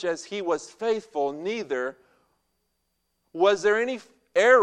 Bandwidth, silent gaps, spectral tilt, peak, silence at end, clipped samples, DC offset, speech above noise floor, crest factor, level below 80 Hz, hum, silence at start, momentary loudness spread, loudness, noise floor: 10 kHz; none; -3.5 dB/octave; -6 dBFS; 0 s; under 0.1%; under 0.1%; 52 dB; 20 dB; -74 dBFS; none; 0 s; 10 LU; -26 LUFS; -76 dBFS